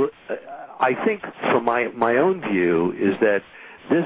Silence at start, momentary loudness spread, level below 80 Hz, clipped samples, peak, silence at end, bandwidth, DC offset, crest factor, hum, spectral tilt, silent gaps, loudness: 0 s; 13 LU; -60 dBFS; under 0.1%; -6 dBFS; 0 s; 4 kHz; under 0.1%; 16 dB; none; -10 dB/octave; none; -21 LUFS